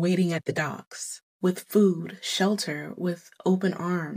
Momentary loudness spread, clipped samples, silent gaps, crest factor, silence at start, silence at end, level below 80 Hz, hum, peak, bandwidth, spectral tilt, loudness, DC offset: 11 LU; under 0.1%; 0.87-0.91 s, 1.23-1.39 s; 16 dB; 0 s; 0 s; -80 dBFS; none; -10 dBFS; 16 kHz; -5.5 dB/octave; -27 LUFS; under 0.1%